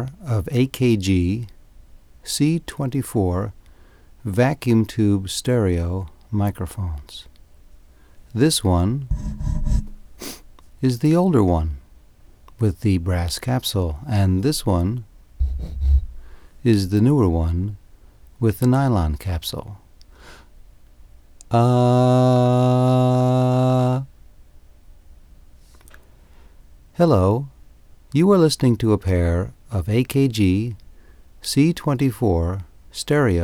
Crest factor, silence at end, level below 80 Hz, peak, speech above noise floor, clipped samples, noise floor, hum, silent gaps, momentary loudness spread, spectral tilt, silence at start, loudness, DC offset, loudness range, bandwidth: 16 dB; 0 s; -32 dBFS; -4 dBFS; 29 dB; under 0.1%; -48 dBFS; none; none; 15 LU; -6.5 dB/octave; 0 s; -20 LUFS; under 0.1%; 6 LU; 16.5 kHz